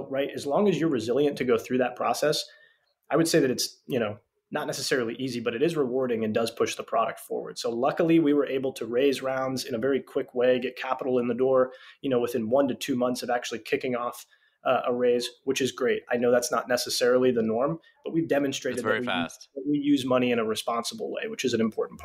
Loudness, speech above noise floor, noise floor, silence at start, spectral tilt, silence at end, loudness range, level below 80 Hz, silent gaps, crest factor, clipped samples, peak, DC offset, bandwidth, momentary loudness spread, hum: -27 LUFS; 36 dB; -63 dBFS; 0 s; -4.5 dB/octave; 0 s; 2 LU; -70 dBFS; none; 14 dB; under 0.1%; -12 dBFS; under 0.1%; 16 kHz; 8 LU; none